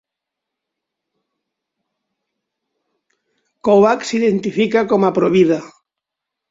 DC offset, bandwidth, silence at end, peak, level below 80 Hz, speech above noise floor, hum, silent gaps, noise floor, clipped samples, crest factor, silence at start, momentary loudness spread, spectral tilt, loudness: under 0.1%; 7.8 kHz; 0.85 s; -2 dBFS; -60 dBFS; 68 dB; none; none; -82 dBFS; under 0.1%; 18 dB; 3.65 s; 5 LU; -6 dB/octave; -15 LUFS